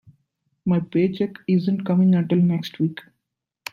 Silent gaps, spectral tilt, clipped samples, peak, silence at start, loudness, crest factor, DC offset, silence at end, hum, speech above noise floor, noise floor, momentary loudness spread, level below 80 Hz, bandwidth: none; -8.5 dB/octave; under 0.1%; -8 dBFS; 0.65 s; -21 LUFS; 14 dB; under 0.1%; 0.7 s; none; 60 dB; -81 dBFS; 10 LU; -64 dBFS; 7.2 kHz